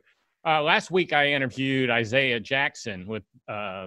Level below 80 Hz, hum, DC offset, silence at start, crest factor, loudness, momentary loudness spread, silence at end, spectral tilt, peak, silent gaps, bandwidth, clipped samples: -68 dBFS; none; under 0.1%; 0.45 s; 20 dB; -24 LUFS; 14 LU; 0 s; -4.5 dB/octave; -6 dBFS; none; 11.5 kHz; under 0.1%